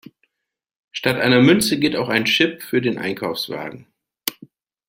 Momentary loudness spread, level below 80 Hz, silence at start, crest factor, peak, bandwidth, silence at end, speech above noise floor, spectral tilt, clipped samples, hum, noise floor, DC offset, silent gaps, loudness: 14 LU; -58 dBFS; 0.95 s; 20 dB; -2 dBFS; 16.5 kHz; 0.55 s; 63 dB; -4.5 dB/octave; under 0.1%; none; -81 dBFS; under 0.1%; none; -19 LUFS